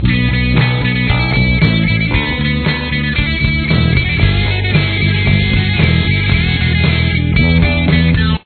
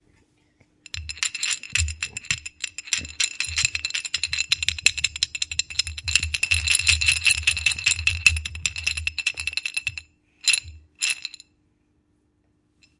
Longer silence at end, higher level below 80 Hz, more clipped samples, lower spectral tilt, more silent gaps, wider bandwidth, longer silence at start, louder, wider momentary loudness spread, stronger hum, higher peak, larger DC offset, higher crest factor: second, 0.1 s vs 1.7 s; first, -20 dBFS vs -44 dBFS; neither; first, -9 dB/octave vs 1 dB/octave; neither; second, 4.6 kHz vs 12 kHz; second, 0 s vs 0.95 s; first, -13 LUFS vs -22 LUFS; second, 3 LU vs 10 LU; neither; about the same, 0 dBFS vs 0 dBFS; neither; second, 12 dB vs 26 dB